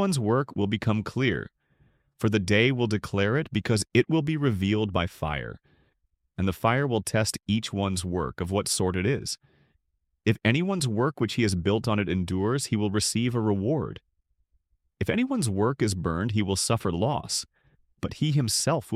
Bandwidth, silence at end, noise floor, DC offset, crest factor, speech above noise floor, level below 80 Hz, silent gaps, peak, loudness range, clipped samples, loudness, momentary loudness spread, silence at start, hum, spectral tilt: 15.5 kHz; 0 s; -76 dBFS; under 0.1%; 20 dB; 50 dB; -52 dBFS; none; -8 dBFS; 3 LU; under 0.1%; -26 LUFS; 7 LU; 0 s; none; -5 dB/octave